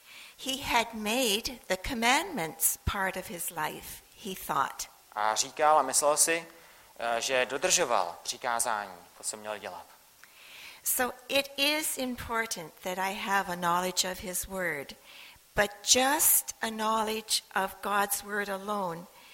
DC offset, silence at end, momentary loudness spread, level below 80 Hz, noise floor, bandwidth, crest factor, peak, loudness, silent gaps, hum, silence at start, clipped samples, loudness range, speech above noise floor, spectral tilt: under 0.1%; 0 s; 15 LU; -56 dBFS; -56 dBFS; 16.5 kHz; 22 dB; -8 dBFS; -29 LUFS; none; none; 0.1 s; under 0.1%; 5 LU; 26 dB; -1.5 dB/octave